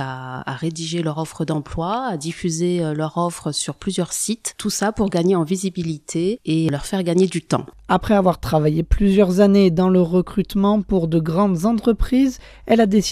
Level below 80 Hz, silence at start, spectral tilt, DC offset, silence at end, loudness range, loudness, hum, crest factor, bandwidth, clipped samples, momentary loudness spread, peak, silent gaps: -34 dBFS; 0 s; -6 dB/octave; under 0.1%; 0 s; 6 LU; -20 LUFS; none; 18 dB; 15 kHz; under 0.1%; 9 LU; 0 dBFS; none